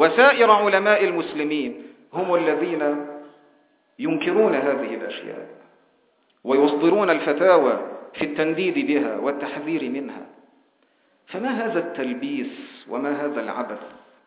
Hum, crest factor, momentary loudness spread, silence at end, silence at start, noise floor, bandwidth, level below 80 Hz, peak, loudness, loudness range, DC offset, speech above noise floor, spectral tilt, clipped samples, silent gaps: none; 22 dB; 17 LU; 0.3 s; 0 s; -64 dBFS; 4 kHz; -72 dBFS; 0 dBFS; -21 LUFS; 8 LU; under 0.1%; 43 dB; -9 dB/octave; under 0.1%; none